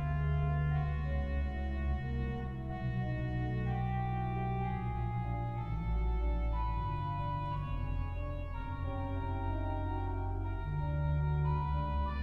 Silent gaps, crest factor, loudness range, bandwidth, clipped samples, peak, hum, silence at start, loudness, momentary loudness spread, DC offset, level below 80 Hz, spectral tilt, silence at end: none; 12 dB; 2 LU; 4.7 kHz; under 0.1%; -22 dBFS; none; 0 s; -36 LUFS; 6 LU; under 0.1%; -38 dBFS; -9.5 dB/octave; 0 s